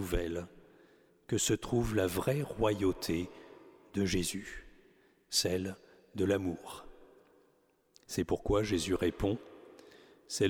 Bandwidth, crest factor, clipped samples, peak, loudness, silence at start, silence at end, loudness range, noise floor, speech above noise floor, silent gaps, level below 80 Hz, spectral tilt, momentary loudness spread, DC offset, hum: 20 kHz; 18 dB; under 0.1%; -16 dBFS; -34 LUFS; 0 s; 0 s; 3 LU; -71 dBFS; 38 dB; none; -50 dBFS; -4.5 dB/octave; 18 LU; under 0.1%; none